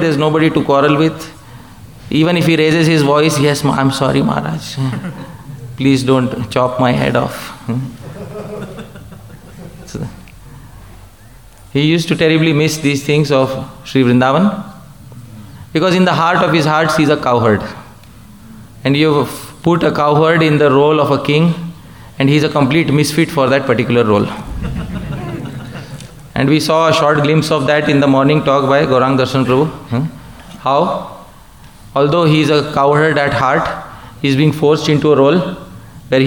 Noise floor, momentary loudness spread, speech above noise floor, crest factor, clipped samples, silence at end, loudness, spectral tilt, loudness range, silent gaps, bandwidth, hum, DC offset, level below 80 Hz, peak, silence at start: -40 dBFS; 17 LU; 28 dB; 12 dB; under 0.1%; 0 s; -13 LUFS; -6 dB/octave; 5 LU; none; 19 kHz; none; 0.4%; -40 dBFS; 0 dBFS; 0 s